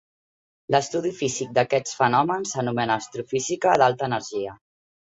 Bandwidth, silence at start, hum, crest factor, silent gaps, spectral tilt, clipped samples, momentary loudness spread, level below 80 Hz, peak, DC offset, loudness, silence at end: 8.4 kHz; 0.7 s; none; 20 dB; none; -4 dB/octave; under 0.1%; 8 LU; -64 dBFS; -4 dBFS; under 0.1%; -23 LUFS; 0.6 s